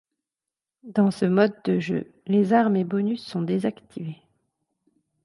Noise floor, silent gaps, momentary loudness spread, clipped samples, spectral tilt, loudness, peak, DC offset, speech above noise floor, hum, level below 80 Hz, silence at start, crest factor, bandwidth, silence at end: -89 dBFS; none; 14 LU; under 0.1%; -8 dB/octave; -23 LUFS; -6 dBFS; under 0.1%; 66 dB; none; -70 dBFS; 0.85 s; 18 dB; 11.5 kHz; 1.1 s